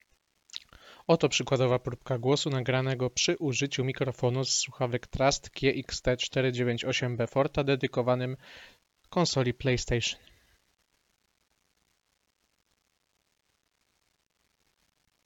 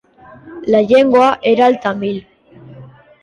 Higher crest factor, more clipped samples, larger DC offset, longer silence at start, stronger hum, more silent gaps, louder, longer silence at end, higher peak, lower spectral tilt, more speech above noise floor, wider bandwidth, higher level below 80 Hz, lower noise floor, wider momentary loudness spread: first, 22 dB vs 14 dB; neither; neither; about the same, 0.55 s vs 0.45 s; neither; neither; second, -29 LUFS vs -13 LUFS; first, 5.1 s vs 0.4 s; second, -10 dBFS vs -2 dBFS; second, -4.5 dB/octave vs -6 dB/octave; first, 47 dB vs 26 dB; second, 8 kHz vs 9.6 kHz; about the same, -52 dBFS vs -54 dBFS; first, -76 dBFS vs -39 dBFS; second, 8 LU vs 13 LU